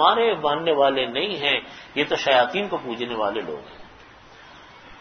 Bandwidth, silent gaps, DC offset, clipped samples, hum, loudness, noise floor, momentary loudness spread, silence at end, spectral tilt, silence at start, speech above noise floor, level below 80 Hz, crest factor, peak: 6.6 kHz; none; under 0.1%; under 0.1%; none; -22 LUFS; -47 dBFS; 11 LU; 0 s; -4 dB/octave; 0 s; 25 dB; -60 dBFS; 22 dB; -2 dBFS